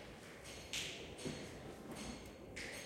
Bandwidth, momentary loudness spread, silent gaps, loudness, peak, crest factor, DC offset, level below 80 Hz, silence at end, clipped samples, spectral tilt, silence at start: 16.5 kHz; 9 LU; none; -48 LUFS; -28 dBFS; 22 dB; under 0.1%; -64 dBFS; 0 s; under 0.1%; -3 dB/octave; 0 s